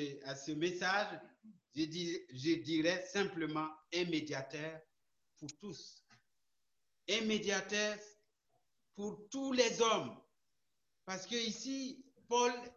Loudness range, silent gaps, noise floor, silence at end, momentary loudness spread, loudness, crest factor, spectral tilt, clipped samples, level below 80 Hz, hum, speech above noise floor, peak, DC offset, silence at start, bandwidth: 6 LU; none; -88 dBFS; 0.05 s; 16 LU; -37 LUFS; 22 dB; -3.5 dB/octave; under 0.1%; -78 dBFS; none; 51 dB; -18 dBFS; under 0.1%; 0 s; 8.2 kHz